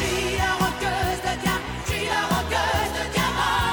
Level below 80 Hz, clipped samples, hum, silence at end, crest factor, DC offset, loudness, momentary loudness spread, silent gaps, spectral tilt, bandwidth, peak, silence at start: -36 dBFS; under 0.1%; none; 0 s; 16 dB; under 0.1%; -24 LUFS; 3 LU; none; -3.5 dB/octave; over 20 kHz; -8 dBFS; 0 s